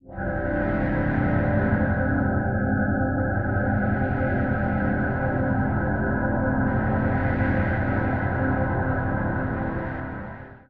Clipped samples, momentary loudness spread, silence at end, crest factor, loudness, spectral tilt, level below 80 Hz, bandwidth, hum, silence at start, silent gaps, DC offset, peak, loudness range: under 0.1%; 4 LU; 0 s; 14 dB; -24 LUFS; -11.5 dB/octave; -36 dBFS; 4.4 kHz; none; 0 s; none; 0.6%; -10 dBFS; 1 LU